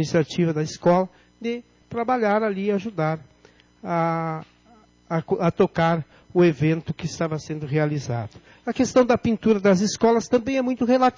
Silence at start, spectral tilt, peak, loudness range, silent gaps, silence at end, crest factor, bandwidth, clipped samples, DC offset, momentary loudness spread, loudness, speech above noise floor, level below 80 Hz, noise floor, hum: 0 s; -6.5 dB/octave; -8 dBFS; 4 LU; none; 0.05 s; 14 dB; 7.6 kHz; under 0.1%; under 0.1%; 12 LU; -23 LUFS; 33 dB; -54 dBFS; -55 dBFS; none